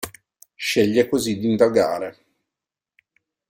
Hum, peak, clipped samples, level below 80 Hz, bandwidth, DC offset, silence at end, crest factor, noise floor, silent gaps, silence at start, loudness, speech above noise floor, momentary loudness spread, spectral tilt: none; -4 dBFS; under 0.1%; -60 dBFS; 16.5 kHz; under 0.1%; 1.4 s; 18 dB; -87 dBFS; none; 0 s; -20 LUFS; 68 dB; 12 LU; -4.5 dB/octave